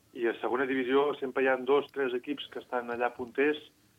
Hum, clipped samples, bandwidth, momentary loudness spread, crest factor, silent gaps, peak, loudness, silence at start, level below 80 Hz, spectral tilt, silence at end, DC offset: none; under 0.1%; 7.4 kHz; 8 LU; 16 dB; none; -14 dBFS; -30 LUFS; 0.15 s; -76 dBFS; -5.5 dB/octave; 0.3 s; under 0.1%